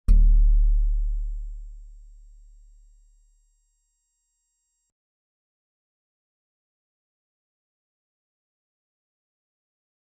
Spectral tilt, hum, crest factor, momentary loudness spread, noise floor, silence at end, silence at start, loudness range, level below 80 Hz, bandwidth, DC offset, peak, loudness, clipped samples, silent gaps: -9 dB/octave; none; 20 dB; 22 LU; -75 dBFS; 8.25 s; 0.1 s; 23 LU; -26 dBFS; 1.2 kHz; under 0.1%; -6 dBFS; -25 LUFS; under 0.1%; none